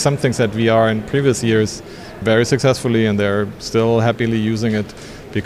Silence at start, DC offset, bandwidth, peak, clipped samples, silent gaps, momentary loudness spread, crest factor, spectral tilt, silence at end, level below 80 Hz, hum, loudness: 0 s; under 0.1%; 14.5 kHz; -2 dBFS; under 0.1%; none; 9 LU; 16 dB; -6 dB/octave; 0 s; -44 dBFS; none; -17 LUFS